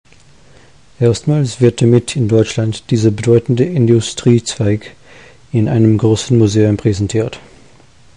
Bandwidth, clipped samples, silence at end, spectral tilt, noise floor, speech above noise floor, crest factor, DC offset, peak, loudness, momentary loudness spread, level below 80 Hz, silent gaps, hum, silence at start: 10.5 kHz; under 0.1%; 0.8 s; -6.5 dB/octave; -46 dBFS; 34 dB; 14 dB; 0.5%; 0 dBFS; -14 LUFS; 6 LU; -40 dBFS; none; none; 1 s